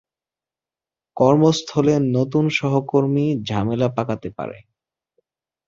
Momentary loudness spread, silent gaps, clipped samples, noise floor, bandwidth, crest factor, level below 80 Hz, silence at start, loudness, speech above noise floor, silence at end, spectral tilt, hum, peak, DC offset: 13 LU; none; under 0.1%; under -90 dBFS; 7.8 kHz; 18 dB; -54 dBFS; 1.15 s; -19 LUFS; over 71 dB; 1.1 s; -7 dB/octave; none; -2 dBFS; under 0.1%